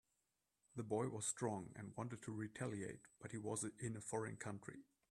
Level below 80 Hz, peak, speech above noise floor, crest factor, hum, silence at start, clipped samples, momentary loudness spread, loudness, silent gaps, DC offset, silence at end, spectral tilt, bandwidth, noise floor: -80 dBFS; -28 dBFS; 41 dB; 20 dB; none; 0.75 s; under 0.1%; 11 LU; -47 LUFS; none; under 0.1%; 0.25 s; -5 dB/octave; 13 kHz; -88 dBFS